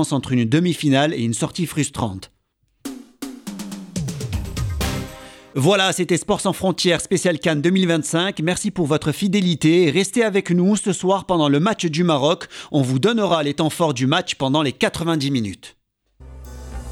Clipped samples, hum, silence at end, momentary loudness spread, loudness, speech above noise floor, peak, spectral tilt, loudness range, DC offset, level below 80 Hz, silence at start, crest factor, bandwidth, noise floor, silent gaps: under 0.1%; none; 0 s; 15 LU; -19 LUFS; 47 dB; -2 dBFS; -5 dB/octave; 9 LU; under 0.1%; -40 dBFS; 0 s; 16 dB; 16.5 kHz; -66 dBFS; none